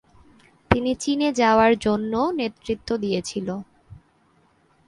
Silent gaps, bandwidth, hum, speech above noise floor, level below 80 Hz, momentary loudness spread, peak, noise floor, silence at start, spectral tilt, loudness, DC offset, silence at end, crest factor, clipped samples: none; 11.5 kHz; none; 39 dB; -46 dBFS; 12 LU; 0 dBFS; -61 dBFS; 0.7 s; -5 dB/octave; -22 LUFS; under 0.1%; 0.9 s; 24 dB; under 0.1%